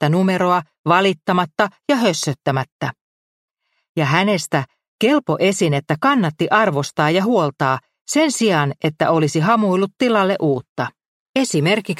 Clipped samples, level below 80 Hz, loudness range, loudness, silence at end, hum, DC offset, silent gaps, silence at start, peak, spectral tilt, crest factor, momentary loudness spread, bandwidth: under 0.1%; -62 dBFS; 3 LU; -18 LUFS; 0.05 s; none; under 0.1%; 0.79-0.84 s, 2.72-2.79 s, 3.01-3.48 s, 3.89-3.95 s, 4.88-4.98 s, 8.01-8.05 s, 10.69-10.76 s, 11.08-11.34 s; 0 s; 0 dBFS; -5 dB/octave; 18 dB; 7 LU; 15 kHz